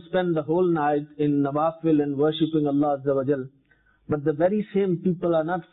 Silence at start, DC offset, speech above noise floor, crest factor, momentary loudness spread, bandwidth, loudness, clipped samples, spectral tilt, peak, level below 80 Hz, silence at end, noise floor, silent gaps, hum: 0.05 s; under 0.1%; 39 dB; 14 dB; 4 LU; 4.1 kHz; -24 LUFS; under 0.1%; -12 dB/octave; -10 dBFS; -60 dBFS; 0.1 s; -62 dBFS; none; none